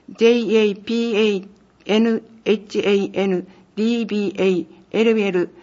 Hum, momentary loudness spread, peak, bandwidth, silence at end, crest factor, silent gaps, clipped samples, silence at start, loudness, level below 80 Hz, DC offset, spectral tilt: none; 8 LU; -4 dBFS; 7.4 kHz; 0.15 s; 16 dB; none; under 0.1%; 0.1 s; -19 LUFS; -66 dBFS; under 0.1%; -6 dB/octave